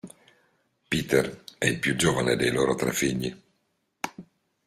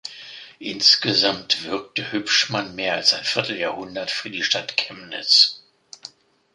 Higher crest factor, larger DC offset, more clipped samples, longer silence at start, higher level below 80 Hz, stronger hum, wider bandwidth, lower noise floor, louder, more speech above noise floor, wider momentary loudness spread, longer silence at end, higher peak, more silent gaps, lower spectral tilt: about the same, 20 dB vs 22 dB; neither; neither; about the same, 0.05 s vs 0.05 s; first, -54 dBFS vs -66 dBFS; neither; first, 15.5 kHz vs 11.5 kHz; first, -74 dBFS vs -45 dBFS; second, -26 LUFS vs -19 LUFS; first, 49 dB vs 23 dB; second, 13 LU vs 20 LU; about the same, 0.45 s vs 0.45 s; second, -8 dBFS vs -2 dBFS; neither; first, -4 dB/octave vs -2 dB/octave